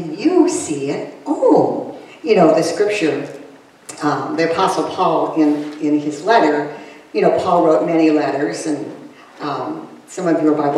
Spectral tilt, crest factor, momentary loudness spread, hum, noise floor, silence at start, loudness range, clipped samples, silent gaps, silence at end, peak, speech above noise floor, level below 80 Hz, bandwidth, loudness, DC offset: -5.5 dB/octave; 16 dB; 15 LU; none; -39 dBFS; 0 s; 2 LU; under 0.1%; none; 0 s; 0 dBFS; 23 dB; -66 dBFS; 12 kHz; -17 LUFS; under 0.1%